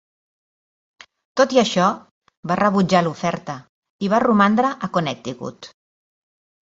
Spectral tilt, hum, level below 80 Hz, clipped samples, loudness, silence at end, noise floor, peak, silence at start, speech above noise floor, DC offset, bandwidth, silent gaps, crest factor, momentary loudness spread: -5.5 dB/octave; none; -60 dBFS; under 0.1%; -19 LUFS; 1 s; under -90 dBFS; -2 dBFS; 1.35 s; over 71 dB; under 0.1%; 8 kHz; 2.11-2.21 s, 2.37-2.43 s, 3.69-3.82 s, 3.90-3.99 s; 20 dB; 18 LU